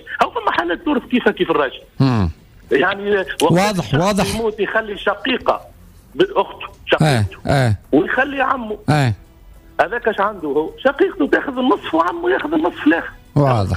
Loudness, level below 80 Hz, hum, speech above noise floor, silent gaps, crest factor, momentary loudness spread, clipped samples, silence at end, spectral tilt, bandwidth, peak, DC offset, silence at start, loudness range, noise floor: -18 LUFS; -42 dBFS; none; 26 dB; none; 14 dB; 5 LU; under 0.1%; 0 s; -6 dB/octave; 15.5 kHz; -4 dBFS; under 0.1%; 0.05 s; 2 LU; -43 dBFS